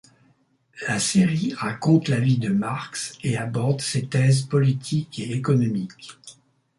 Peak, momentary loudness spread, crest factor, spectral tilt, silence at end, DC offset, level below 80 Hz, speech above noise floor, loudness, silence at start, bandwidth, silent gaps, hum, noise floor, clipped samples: -6 dBFS; 10 LU; 18 dB; -5.5 dB/octave; 0.45 s; under 0.1%; -58 dBFS; 40 dB; -23 LUFS; 0.75 s; 11.5 kHz; none; none; -63 dBFS; under 0.1%